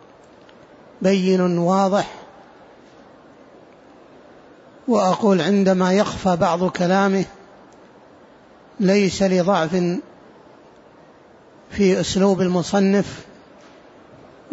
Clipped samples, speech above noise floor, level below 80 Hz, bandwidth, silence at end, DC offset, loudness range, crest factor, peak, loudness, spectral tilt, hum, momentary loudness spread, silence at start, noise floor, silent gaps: under 0.1%; 31 dB; -54 dBFS; 8 kHz; 0 s; under 0.1%; 5 LU; 16 dB; -6 dBFS; -19 LUFS; -6 dB/octave; none; 10 LU; 1 s; -48 dBFS; none